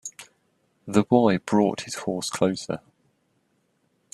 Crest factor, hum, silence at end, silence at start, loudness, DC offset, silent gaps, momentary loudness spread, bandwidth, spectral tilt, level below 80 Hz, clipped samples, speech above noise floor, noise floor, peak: 22 dB; none; 1.35 s; 0.05 s; -24 LUFS; under 0.1%; none; 15 LU; 12.5 kHz; -5.5 dB/octave; -66 dBFS; under 0.1%; 47 dB; -69 dBFS; -4 dBFS